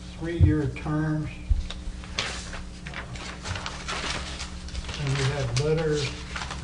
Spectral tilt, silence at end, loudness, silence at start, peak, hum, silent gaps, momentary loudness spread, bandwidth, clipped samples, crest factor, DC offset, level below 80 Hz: -5 dB/octave; 0 s; -29 LUFS; 0 s; -8 dBFS; none; none; 13 LU; 10.5 kHz; under 0.1%; 20 dB; under 0.1%; -36 dBFS